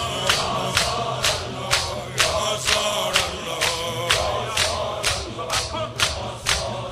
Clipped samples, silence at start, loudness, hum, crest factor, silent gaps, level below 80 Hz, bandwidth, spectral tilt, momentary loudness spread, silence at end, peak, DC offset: under 0.1%; 0 s; -22 LUFS; none; 22 dB; none; -42 dBFS; 16 kHz; -2 dB/octave; 5 LU; 0 s; -2 dBFS; under 0.1%